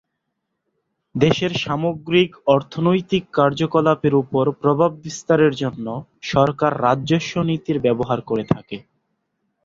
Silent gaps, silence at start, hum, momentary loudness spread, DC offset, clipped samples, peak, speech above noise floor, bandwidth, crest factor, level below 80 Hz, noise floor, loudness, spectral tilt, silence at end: none; 1.15 s; none; 8 LU; under 0.1%; under 0.1%; -2 dBFS; 58 dB; 7.8 kHz; 18 dB; -52 dBFS; -76 dBFS; -19 LUFS; -6.5 dB/octave; 0.85 s